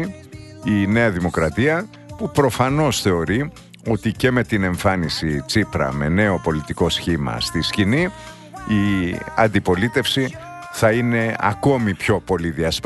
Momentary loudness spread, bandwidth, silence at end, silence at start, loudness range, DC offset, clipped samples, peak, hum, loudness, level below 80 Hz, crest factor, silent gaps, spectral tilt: 10 LU; 12.5 kHz; 0 s; 0 s; 1 LU; under 0.1%; under 0.1%; -2 dBFS; none; -20 LUFS; -40 dBFS; 18 dB; none; -5.5 dB/octave